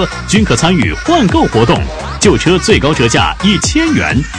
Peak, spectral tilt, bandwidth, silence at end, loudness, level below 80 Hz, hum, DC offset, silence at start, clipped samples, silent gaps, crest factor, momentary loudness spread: 0 dBFS; -4.5 dB/octave; 11 kHz; 0 s; -10 LUFS; -24 dBFS; none; under 0.1%; 0 s; 0.2%; none; 10 dB; 3 LU